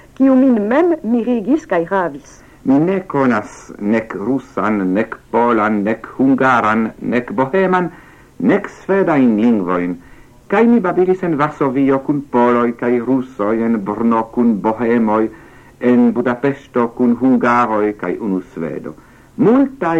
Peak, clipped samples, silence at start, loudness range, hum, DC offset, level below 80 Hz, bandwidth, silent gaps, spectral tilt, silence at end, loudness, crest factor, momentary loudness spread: -2 dBFS; under 0.1%; 0.2 s; 2 LU; none; under 0.1%; -50 dBFS; 8 kHz; none; -8 dB/octave; 0 s; -15 LUFS; 14 dB; 8 LU